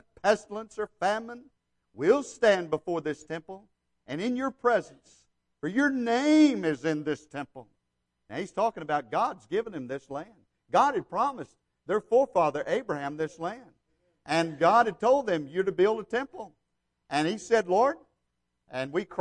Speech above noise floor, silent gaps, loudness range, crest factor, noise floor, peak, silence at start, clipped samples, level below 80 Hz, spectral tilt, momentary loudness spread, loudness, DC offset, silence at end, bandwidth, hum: 52 dB; none; 5 LU; 20 dB; -80 dBFS; -10 dBFS; 0.25 s; under 0.1%; -68 dBFS; -5 dB/octave; 17 LU; -28 LUFS; under 0.1%; 0 s; 10.5 kHz; none